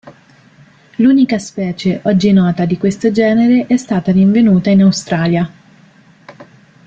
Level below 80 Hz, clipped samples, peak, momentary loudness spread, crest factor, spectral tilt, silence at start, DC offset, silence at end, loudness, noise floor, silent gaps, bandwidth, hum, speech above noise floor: -50 dBFS; under 0.1%; -2 dBFS; 8 LU; 12 dB; -7 dB/octave; 0.05 s; under 0.1%; 0.45 s; -12 LUFS; -45 dBFS; none; 8 kHz; none; 34 dB